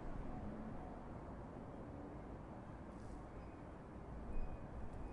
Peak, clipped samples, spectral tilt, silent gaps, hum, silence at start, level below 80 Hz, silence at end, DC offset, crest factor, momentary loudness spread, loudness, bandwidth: -30 dBFS; under 0.1%; -8.5 dB/octave; none; none; 0 s; -52 dBFS; 0 s; under 0.1%; 18 dB; 4 LU; -52 LUFS; 10.5 kHz